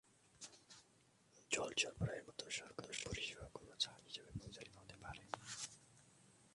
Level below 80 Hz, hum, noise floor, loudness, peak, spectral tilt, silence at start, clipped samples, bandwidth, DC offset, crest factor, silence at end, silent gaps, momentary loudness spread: -66 dBFS; none; -73 dBFS; -46 LUFS; -24 dBFS; -2.5 dB/octave; 0.25 s; under 0.1%; 11.5 kHz; under 0.1%; 26 dB; 0 s; none; 20 LU